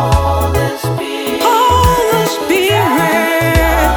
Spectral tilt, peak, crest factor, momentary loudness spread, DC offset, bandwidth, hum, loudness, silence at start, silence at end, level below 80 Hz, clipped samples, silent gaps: -5 dB/octave; 0 dBFS; 12 dB; 8 LU; under 0.1%; over 20 kHz; none; -12 LUFS; 0 s; 0 s; -22 dBFS; under 0.1%; none